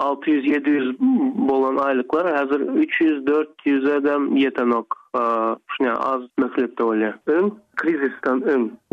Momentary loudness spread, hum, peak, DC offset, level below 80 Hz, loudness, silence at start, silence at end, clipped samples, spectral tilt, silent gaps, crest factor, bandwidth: 4 LU; none; -8 dBFS; under 0.1%; -68 dBFS; -21 LUFS; 0 s; 0.15 s; under 0.1%; -7 dB/octave; none; 12 dB; 5.4 kHz